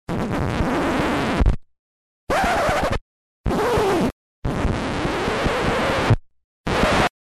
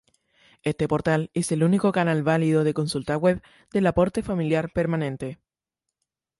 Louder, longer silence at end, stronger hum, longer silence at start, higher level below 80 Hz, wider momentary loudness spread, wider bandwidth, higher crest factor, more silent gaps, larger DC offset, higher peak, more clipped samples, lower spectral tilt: about the same, -22 LUFS vs -24 LUFS; second, 0.3 s vs 1.05 s; neither; second, 0.1 s vs 0.65 s; first, -30 dBFS vs -50 dBFS; about the same, 7 LU vs 9 LU; first, 14 kHz vs 11.5 kHz; about the same, 16 dB vs 18 dB; first, 1.79-2.27 s, 3.01-3.44 s, 4.12-4.42 s, 6.44-6.64 s vs none; neither; about the same, -6 dBFS vs -8 dBFS; neither; about the same, -5.5 dB/octave vs -6.5 dB/octave